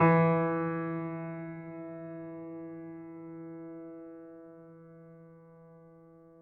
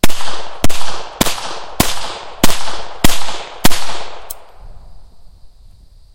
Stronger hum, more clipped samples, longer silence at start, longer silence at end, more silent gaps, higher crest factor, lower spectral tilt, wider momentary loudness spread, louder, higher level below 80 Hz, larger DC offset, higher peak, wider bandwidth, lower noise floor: neither; second, under 0.1% vs 2%; about the same, 0 s vs 0.05 s; second, 0 s vs 0.85 s; neither; first, 20 dB vs 10 dB; first, -8.5 dB/octave vs -3 dB/octave; first, 26 LU vs 11 LU; second, -34 LUFS vs -19 LUFS; second, -78 dBFS vs -28 dBFS; neither; second, -14 dBFS vs 0 dBFS; second, 4 kHz vs over 20 kHz; first, -56 dBFS vs -40 dBFS